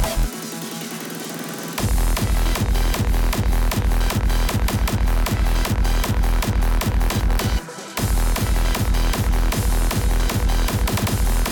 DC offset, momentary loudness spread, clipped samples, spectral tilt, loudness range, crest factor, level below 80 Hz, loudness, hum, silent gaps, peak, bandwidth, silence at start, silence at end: under 0.1%; 7 LU; under 0.1%; -4.5 dB/octave; 1 LU; 8 dB; -20 dBFS; -22 LUFS; none; none; -12 dBFS; 19 kHz; 0 s; 0 s